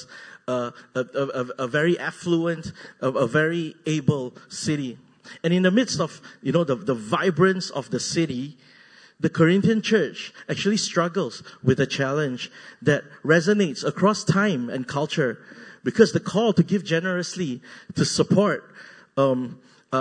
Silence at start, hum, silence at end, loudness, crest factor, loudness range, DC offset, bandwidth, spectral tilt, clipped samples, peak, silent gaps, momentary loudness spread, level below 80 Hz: 0 s; none; 0 s; -23 LUFS; 22 dB; 2 LU; under 0.1%; 9.6 kHz; -5.5 dB/octave; under 0.1%; -2 dBFS; none; 12 LU; -62 dBFS